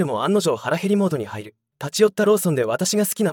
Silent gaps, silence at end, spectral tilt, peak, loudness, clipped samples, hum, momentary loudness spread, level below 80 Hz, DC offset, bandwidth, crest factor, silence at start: none; 0 s; -5 dB/octave; -4 dBFS; -20 LUFS; under 0.1%; none; 11 LU; -72 dBFS; under 0.1%; 18 kHz; 16 dB; 0 s